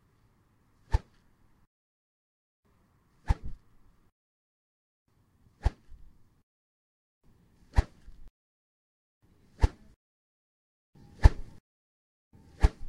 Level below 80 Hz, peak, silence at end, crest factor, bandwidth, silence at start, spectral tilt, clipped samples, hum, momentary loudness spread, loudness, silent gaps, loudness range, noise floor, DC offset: -36 dBFS; -2 dBFS; 0 s; 32 dB; 10.5 kHz; 0.9 s; -7 dB/octave; under 0.1%; none; 23 LU; -31 LUFS; 1.67-2.63 s, 4.12-5.06 s, 6.43-7.21 s, 8.30-9.21 s, 9.96-10.93 s, 11.60-12.31 s; 11 LU; -67 dBFS; under 0.1%